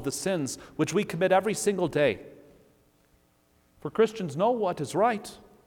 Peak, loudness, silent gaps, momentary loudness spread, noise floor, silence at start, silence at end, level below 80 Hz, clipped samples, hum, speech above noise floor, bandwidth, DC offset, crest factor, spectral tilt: -10 dBFS; -27 LUFS; none; 11 LU; -65 dBFS; 0 s; 0.3 s; -62 dBFS; under 0.1%; none; 39 dB; 18.5 kHz; under 0.1%; 18 dB; -5 dB/octave